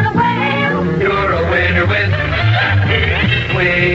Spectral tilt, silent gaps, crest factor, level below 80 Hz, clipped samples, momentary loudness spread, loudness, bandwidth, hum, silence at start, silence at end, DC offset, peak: -7 dB/octave; none; 12 dB; -30 dBFS; under 0.1%; 2 LU; -14 LUFS; 7.4 kHz; none; 0 s; 0 s; under 0.1%; 0 dBFS